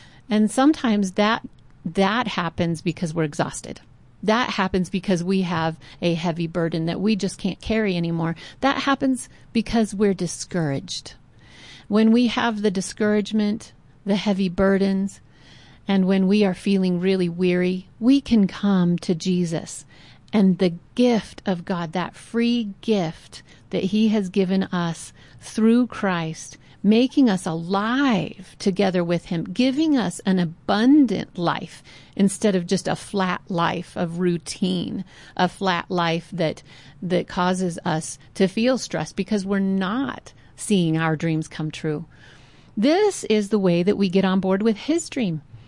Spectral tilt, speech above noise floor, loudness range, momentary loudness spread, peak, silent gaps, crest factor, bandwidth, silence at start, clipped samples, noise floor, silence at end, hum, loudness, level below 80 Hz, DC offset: -6 dB/octave; 27 dB; 3 LU; 10 LU; -8 dBFS; none; 14 dB; 11.5 kHz; 0.3 s; under 0.1%; -48 dBFS; 0.05 s; none; -22 LUFS; -52 dBFS; 0.1%